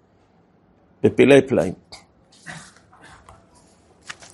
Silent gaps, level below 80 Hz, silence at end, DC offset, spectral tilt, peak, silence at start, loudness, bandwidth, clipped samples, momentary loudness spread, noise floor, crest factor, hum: none; -58 dBFS; 1.75 s; under 0.1%; -6 dB/octave; 0 dBFS; 1.05 s; -17 LUFS; 11.5 kHz; under 0.1%; 26 LU; -58 dBFS; 22 dB; none